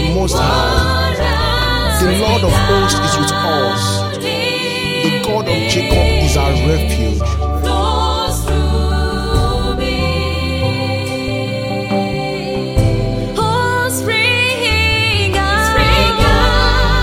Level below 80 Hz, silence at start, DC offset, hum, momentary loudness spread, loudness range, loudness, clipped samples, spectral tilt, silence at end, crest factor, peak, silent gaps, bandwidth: -20 dBFS; 0 s; under 0.1%; none; 6 LU; 5 LU; -14 LUFS; under 0.1%; -4.5 dB/octave; 0 s; 14 dB; 0 dBFS; none; 16.5 kHz